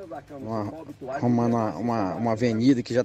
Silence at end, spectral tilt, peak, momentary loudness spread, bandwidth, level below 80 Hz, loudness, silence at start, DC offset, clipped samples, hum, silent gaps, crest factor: 0 s; -7.5 dB/octave; -10 dBFS; 14 LU; 8.4 kHz; -60 dBFS; -25 LUFS; 0 s; under 0.1%; under 0.1%; none; none; 14 dB